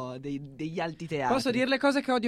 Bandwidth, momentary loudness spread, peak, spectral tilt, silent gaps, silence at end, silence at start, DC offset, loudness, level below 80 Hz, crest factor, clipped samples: 14 kHz; 11 LU; -12 dBFS; -5 dB/octave; none; 0 s; 0 s; under 0.1%; -29 LUFS; -60 dBFS; 16 dB; under 0.1%